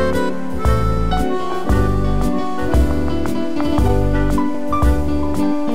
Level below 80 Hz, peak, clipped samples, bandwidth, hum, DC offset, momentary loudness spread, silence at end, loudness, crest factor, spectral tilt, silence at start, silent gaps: -22 dBFS; -2 dBFS; under 0.1%; 16 kHz; none; 10%; 4 LU; 0 s; -19 LUFS; 14 dB; -7.5 dB/octave; 0 s; none